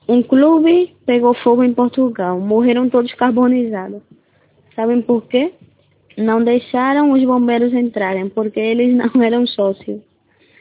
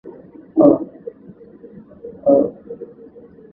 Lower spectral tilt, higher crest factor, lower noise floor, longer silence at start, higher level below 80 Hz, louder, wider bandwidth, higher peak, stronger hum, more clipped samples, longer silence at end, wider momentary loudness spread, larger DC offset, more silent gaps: second, -10 dB/octave vs -12.5 dB/octave; second, 14 dB vs 20 dB; first, -55 dBFS vs -42 dBFS; about the same, 0.1 s vs 0.05 s; about the same, -60 dBFS vs -58 dBFS; about the same, -15 LUFS vs -16 LUFS; first, 4 kHz vs 2.1 kHz; about the same, 0 dBFS vs 0 dBFS; neither; neither; about the same, 0.6 s vs 0.65 s; second, 10 LU vs 24 LU; neither; neither